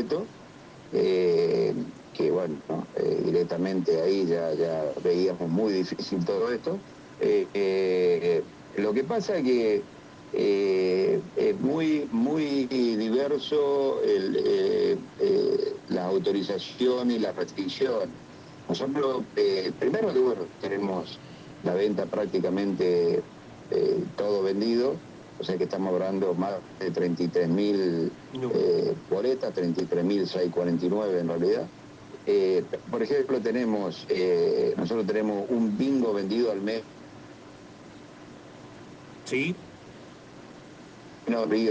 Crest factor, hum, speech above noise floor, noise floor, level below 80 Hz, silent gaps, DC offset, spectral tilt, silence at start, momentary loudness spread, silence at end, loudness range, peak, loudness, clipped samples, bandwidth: 14 dB; none; 21 dB; -47 dBFS; -66 dBFS; none; under 0.1%; -7 dB/octave; 0 s; 21 LU; 0 s; 3 LU; -14 dBFS; -27 LUFS; under 0.1%; 8.2 kHz